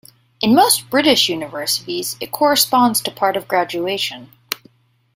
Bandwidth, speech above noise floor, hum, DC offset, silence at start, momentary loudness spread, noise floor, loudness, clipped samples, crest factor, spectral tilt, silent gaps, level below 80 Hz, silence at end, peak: 16.5 kHz; 36 dB; none; under 0.1%; 0.4 s; 13 LU; -53 dBFS; -16 LUFS; under 0.1%; 18 dB; -2.5 dB/octave; none; -58 dBFS; 0.6 s; 0 dBFS